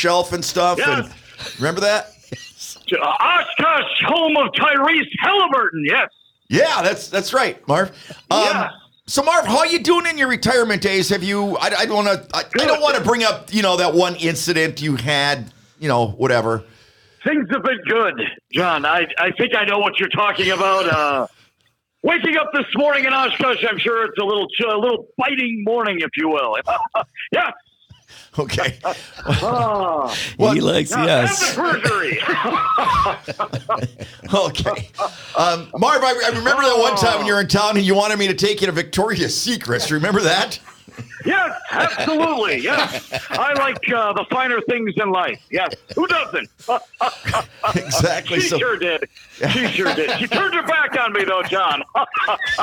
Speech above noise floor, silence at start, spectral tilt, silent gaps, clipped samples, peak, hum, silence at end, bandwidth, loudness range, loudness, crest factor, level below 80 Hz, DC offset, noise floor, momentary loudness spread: 47 dB; 0 s; -3.5 dB/octave; none; under 0.1%; -2 dBFS; none; 0 s; 19.5 kHz; 4 LU; -18 LUFS; 18 dB; -50 dBFS; under 0.1%; -65 dBFS; 8 LU